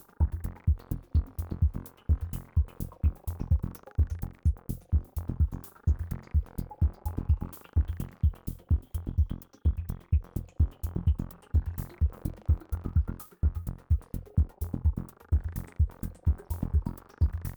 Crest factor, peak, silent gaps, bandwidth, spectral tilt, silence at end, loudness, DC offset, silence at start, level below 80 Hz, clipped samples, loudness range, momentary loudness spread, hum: 18 dB; -12 dBFS; none; over 20 kHz; -8.5 dB/octave; 0 s; -32 LUFS; under 0.1%; 0.2 s; -32 dBFS; under 0.1%; 1 LU; 5 LU; none